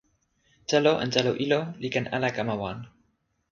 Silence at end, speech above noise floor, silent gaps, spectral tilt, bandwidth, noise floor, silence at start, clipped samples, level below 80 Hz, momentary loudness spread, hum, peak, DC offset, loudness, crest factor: 0.65 s; 46 dB; none; -5 dB/octave; 7.6 kHz; -72 dBFS; 0.7 s; under 0.1%; -62 dBFS; 12 LU; none; -6 dBFS; under 0.1%; -26 LUFS; 22 dB